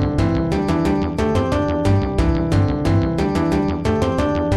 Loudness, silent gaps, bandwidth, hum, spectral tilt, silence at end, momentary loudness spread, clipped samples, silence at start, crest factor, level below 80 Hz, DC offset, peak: -19 LUFS; none; 12 kHz; none; -7.5 dB/octave; 0 s; 2 LU; under 0.1%; 0 s; 12 dB; -28 dBFS; 0.2%; -4 dBFS